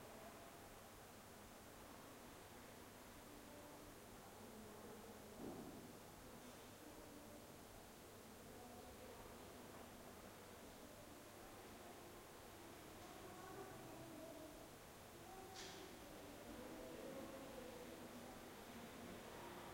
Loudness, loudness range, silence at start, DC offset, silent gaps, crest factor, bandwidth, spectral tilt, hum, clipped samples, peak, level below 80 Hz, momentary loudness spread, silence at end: -58 LUFS; 4 LU; 0 s; under 0.1%; none; 16 dB; 16.5 kHz; -4 dB/octave; none; under 0.1%; -40 dBFS; -72 dBFS; 5 LU; 0 s